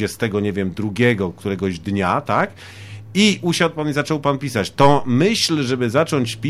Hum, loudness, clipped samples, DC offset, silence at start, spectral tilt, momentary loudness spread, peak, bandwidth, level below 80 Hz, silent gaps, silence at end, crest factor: none; -19 LUFS; under 0.1%; under 0.1%; 0 s; -5 dB/octave; 8 LU; -2 dBFS; 15.5 kHz; -50 dBFS; none; 0 s; 18 dB